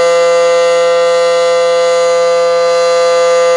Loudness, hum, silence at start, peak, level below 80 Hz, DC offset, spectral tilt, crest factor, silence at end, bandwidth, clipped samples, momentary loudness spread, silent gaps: -10 LUFS; none; 0 s; -2 dBFS; -58 dBFS; under 0.1%; -1 dB/octave; 6 dB; 0 s; 11.5 kHz; under 0.1%; 1 LU; none